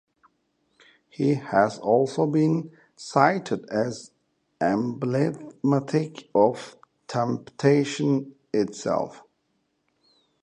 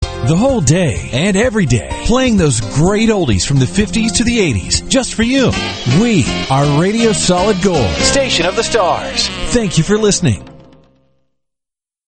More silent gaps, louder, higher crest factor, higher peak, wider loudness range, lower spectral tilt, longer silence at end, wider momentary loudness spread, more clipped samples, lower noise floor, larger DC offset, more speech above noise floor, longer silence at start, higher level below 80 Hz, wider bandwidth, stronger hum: neither; second, -25 LUFS vs -13 LUFS; first, 22 dB vs 14 dB; second, -4 dBFS vs 0 dBFS; about the same, 3 LU vs 2 LU; first, -6.5 dB/octave vs -4.5 dB/octave; second, 1.25 s vs 1.55 s; first, 8 LU vs 4 LU; neither; second, -73 dBFS vs -84 dBFS; neither; second, 49 dB vs 71 dB; first, 1.2 s vs 0 s; second, -68 dBFS vs -28 dBFS; about the same, 10 kHz vs 9.2 kHz; neither